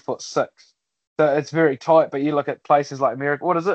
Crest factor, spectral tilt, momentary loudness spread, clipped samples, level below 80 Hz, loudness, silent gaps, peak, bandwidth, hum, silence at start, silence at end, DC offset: 16 dB; -6 dB/octave; 8 LU; under 0.1%; -72 dBFS; -20 LUFS; 1.07-1.16 s; -4 dBFS; 8.4 kHz; none; 0.1 s; 0 s; under 0.1%